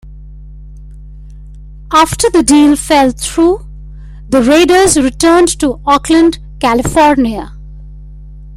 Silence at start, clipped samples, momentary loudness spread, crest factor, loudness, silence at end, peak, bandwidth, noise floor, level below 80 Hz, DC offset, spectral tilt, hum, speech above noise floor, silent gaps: 0.05 s; under 0.1%; 7 LU; 12 dB; -10 LUFS; 0 s; 0 dBFS; 16 kHz; -30 dBFS; -30 dBFS; under 0.1%; -4 dB/octave; 50 Hz at -30 dBFS; 22 dB; none